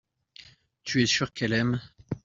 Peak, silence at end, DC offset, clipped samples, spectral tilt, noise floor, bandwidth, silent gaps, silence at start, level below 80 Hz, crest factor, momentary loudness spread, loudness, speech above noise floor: -10 dBFS; 0.05 s; under 0.1%; under 0.1%; -4 dB/octave; -53 dBFS; 7.6 kHz; none; 0.4 s; -58 dBFS; 20 dB; 14 LU; -26 LUFS; 27 dB